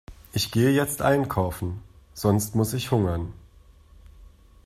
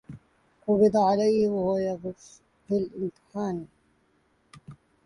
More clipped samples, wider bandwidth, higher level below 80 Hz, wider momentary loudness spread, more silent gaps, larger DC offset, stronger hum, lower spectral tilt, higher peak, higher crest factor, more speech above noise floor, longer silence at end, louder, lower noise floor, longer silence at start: neither; first, 15.5 kHz vs 11 kHz; first, -48 dBFS vs -62 dBFS; second, 12 LU vs 16 LU; neither; neither; neither; second, -5.5 dB/octave vs -7.5 dB/octave; first, -6 dBFS vs -10 dBFS; about the same, 18 dB vs 18 dB; second, 29 dB vs 42 dB; about the same, 0.35 s vs 0.3 s; about the same, -25 LUFS vs -26 LUFS; second, -52 dBFS vs -67 dBFS; about the same, 0.1 s vs 0.1 s